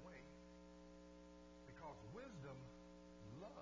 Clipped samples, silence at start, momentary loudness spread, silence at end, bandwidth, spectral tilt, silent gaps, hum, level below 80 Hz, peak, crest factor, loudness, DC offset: under 0.1%; 0 s; 7 LU; 0 s; 8 kHz; -6 dB/octave; none; 60 Hz at -65 dBFS; -70 dBFS; -44 dBFS; 14 dB; -60 LUFS; under 0.1%